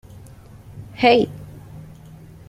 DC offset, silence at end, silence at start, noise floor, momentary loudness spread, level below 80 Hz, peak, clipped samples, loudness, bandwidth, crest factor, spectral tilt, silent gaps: under 0.1%; 0.65 s; 0.75 s; -43 dBFS; 26 LU; -50 dBFS; -2 dBFS; under 0.1%; -18 LUFS; 15 kHz; 22 dB; -6 dB/octave; none